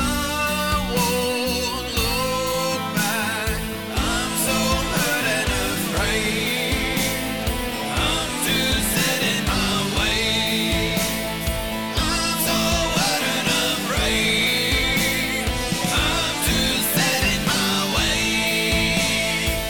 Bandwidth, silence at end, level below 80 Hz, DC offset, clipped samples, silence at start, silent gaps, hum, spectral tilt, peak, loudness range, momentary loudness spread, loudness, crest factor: over 20 kHz; 0 s; -32 dBFS; 0.5%; under 0.1%; 0 s; none; none; -3 dB/octave; -8 dBFS; 3 LU; 5 LU; -20 LUFS; 12 dB